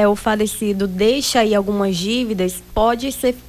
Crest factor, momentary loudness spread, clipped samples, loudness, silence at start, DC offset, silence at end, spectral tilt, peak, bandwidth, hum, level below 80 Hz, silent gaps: 14 dB; 5 LU; under 0.1%; -18 LUFS; 0 s; under 0.1%; 0 s; -4.5 dB/octave; -4 dBFS; 16 kHz; none; -38 dBFS; none